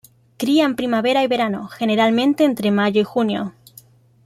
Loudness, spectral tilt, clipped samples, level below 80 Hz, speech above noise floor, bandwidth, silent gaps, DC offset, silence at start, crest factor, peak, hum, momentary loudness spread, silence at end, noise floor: -18 LUFS; -5.5 dB/octave; under 0.1%; -62 dBFS; 31 dB; 15 kHz; none; under 0.1%; 0.4 s; 14 dB; -6 dBFS; none; 7 LU; 0.75 s; -48 dBFS